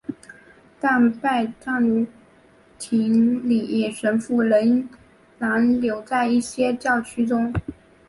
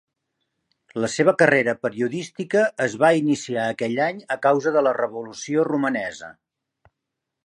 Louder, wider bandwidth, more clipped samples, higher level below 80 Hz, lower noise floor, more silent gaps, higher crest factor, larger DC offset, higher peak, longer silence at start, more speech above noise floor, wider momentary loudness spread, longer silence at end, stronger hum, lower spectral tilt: about the same, -21 LUFS vs -21 LUFS; about the same, 11.5 kHz vs 11 kHz; neither; first, -50 dBFS vs -68 dBFS; second, -53 dBFS vs -82 dBFS; neither; second, 14 dB vs 20 dB; neither; second, -8 dBFS vs -2 dBFS; second, 0.1 s vs 0.95 s; second, 33 dB vs 61 dB; about the same, 10 LU vs 12 LU; second, 0.35 s vs 1.15 s; neither; about the same, -6 dB/octave vs -5 dB/octave